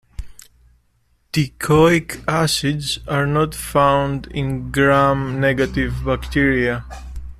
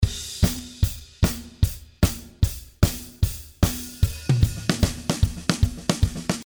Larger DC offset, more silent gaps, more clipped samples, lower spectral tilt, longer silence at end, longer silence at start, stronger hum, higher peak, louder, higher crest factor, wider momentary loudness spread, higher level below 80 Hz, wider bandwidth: neither; neither; neither; about the same, -5.5 dB/octave vs -5 dB/octave; about the same, 0.05 s vs 0 s; first, 0.2 s vs 0 s; neither; about the same, -2 dBFS vs 0 dBFS; first, -18 LUFS vs -25 LUFS; second, 16 dB vs 22 dB; first, 10 LU vs 4 LU; about the same, -34 dBFS vs -30 dBFS; second, 15 kHz vs over 20 kHz